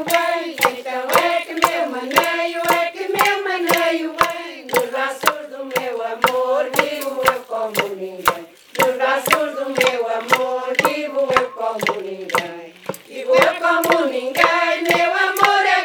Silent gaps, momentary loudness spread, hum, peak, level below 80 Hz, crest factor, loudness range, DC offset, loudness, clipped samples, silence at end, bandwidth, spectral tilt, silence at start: none; 9 LU; none; 0 dBFS; -58 dBFS; 18 dB; 3 LU; under 0.1%; -18 LUFS; under 0.1%; 0 s; over 20 kHz; -2.5 dB/octave; 0 s